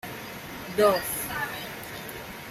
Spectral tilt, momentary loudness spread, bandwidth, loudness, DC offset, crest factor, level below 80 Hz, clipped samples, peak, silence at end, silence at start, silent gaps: -3.5 dB/octave; 15 LU; 16 kHz; -29 LUFS; under 0.1%; 22 dB; -56 dBFS; under 0.1%; -8 dBFS; 0 s; 0.05 s; none